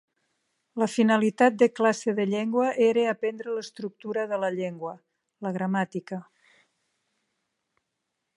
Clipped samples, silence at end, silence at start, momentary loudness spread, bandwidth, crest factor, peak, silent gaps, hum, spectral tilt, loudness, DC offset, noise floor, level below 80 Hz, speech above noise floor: under 0.1%; 2.15 s; 0.75 s; 15 LU; 11.5 kHz; 20 dB; -6 dBFS; none; none; -6 dB/octave; -26 LUFS; under 0.1%; -81 dBFS; -80 dBFS; 56 dB